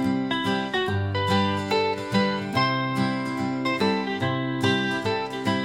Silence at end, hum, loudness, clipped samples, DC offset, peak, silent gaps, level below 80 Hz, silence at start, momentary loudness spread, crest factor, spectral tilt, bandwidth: 0 s; none; -25 LUFS; under 0.1%; under 0.1%; -8 dBFS; none; -62 dBFS; 0 s; 3 LU; 16 dB; -6 dB/octave; 16.5 kHz